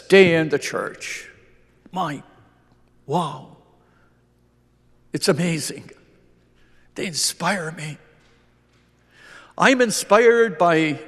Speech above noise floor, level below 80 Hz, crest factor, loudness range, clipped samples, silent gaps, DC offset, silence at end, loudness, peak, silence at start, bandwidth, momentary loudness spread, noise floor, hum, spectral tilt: 40 dB; -62 dBFS; 22 dB; 11 LU; under 0.1%; none; under 0.1%; 0 s; -20 LUFS; 0 dBFS; 0.1 s; 13 kHz; 20 LU; -60 dBFS; 60 Hz at -60 dBFS; -4 dB/octave